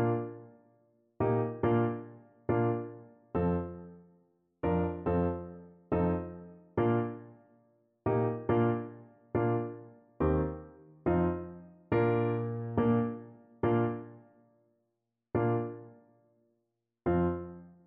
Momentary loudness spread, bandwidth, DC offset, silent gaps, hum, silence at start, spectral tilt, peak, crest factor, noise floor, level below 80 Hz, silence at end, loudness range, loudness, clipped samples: 18 LU; 4 kHz; under 0.1%; none; none; 0 s; -9 dB/octave; -16 dBFS; 18 dB; -84 dBFS; -52 dBFS; 0.15 s; 4 LU; -32 LUFS; under 0.1%